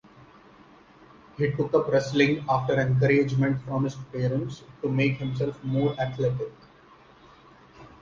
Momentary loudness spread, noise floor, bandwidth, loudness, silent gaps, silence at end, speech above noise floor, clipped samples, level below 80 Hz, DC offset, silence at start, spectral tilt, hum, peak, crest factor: 9 LU; -54 dBFS; 7.4 kHz; -26 LUFS; none; 0.15 s; 29 dB; under 0.1%; -56 dBFS; under 0.1%; 1.4 s; -7.5 dB/octave; none; -8 dBFS; 20 dB